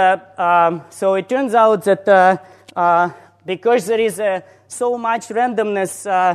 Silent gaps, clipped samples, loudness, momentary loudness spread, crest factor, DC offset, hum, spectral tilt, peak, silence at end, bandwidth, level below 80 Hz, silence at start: none; under 0.1%; -17 LUFS; 10 LU; 16 dB; under 0.1%; none; -4.5 dB/octave; 0 dBFS; 0 s; 13.5 kHz; -70 dBFS; 0 s